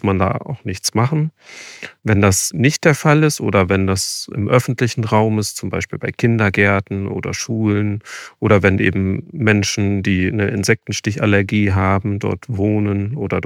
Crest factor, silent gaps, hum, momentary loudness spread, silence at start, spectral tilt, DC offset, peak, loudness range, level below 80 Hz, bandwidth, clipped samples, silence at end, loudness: 16 dB; none; none; 9 LU; 0.05 s; -5.5 dB/octave; under 0.1%; 0 dBFS; 2 LU; -48 dBFS; 16 kHz; under 0.1%; 0 s; -17 LUFS